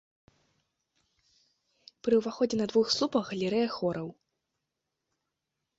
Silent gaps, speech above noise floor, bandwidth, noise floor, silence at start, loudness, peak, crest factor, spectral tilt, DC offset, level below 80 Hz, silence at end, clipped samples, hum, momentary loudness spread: none; 57 dB; 8 kHz; -85 dBFS; 2.05 s; -29 LUFS; -14 dBFS; 20 dB; -5 dB/octave; under 0.1%; -70 dBFS; 1.65 s; under 0.1%; none; 9 LU